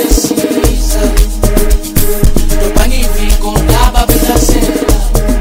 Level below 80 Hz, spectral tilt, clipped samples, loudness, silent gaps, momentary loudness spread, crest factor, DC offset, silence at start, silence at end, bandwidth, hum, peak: -10 dBFS; -4.5 dB/octave; 3%; -11 LUFS; none; 4 LU; 8 dB; under 0.1%; 0 s; 0 s; 16.5 kHz; none; 0 dBFS